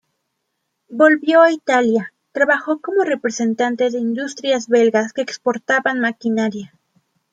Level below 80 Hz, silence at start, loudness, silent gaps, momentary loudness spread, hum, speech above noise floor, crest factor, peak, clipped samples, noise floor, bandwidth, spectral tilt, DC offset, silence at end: -70 dBFS; 0.9 s; -17 LUFS; none; 10 LU; none; 57 dB; 16 dB; -2 dBFS; under 0.1%; -74 dBFS; 9 kHz; -4 dB/octave; under 0.1%; 0.65 s